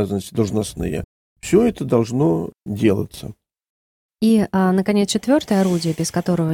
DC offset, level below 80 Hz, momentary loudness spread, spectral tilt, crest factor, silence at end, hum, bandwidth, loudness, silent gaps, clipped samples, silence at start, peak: under 0.1%; -46 dBFS; 12 LU; -6 dB/octave; 16 dB; 0 s; none; 17 kHz; -19 LUFS; 1.04-1.36 s, 3.69-4.09 s; under 0.1%; 0 s; -4 dBFS